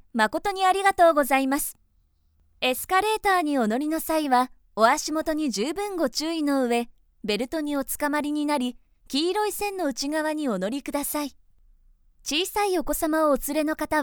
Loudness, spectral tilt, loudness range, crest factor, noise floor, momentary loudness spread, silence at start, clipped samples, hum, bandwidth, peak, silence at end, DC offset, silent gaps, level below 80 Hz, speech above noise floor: -24 LUFS; -3 dB/octave; 5 LU; 20 dB; -65 dBFS; 8 LU; 0.15 s; under 0.1%; none; over 20 kHz; -4 dBFS; 0 s; under 0.1%; none; -50 dBFS; 41 dB